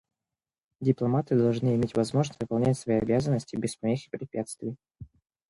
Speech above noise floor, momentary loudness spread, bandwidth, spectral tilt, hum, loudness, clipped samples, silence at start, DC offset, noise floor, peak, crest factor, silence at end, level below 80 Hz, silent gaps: over 63 dB; 10 LU; 11.5 kHz; -7.5 dB/octave; none; -28 LUFS; under 0.1%; 0.8 s; under 0.1%; under -90 dBFS; -10 dBFS; 18 dB; 0.45 s; -58 dBFS; none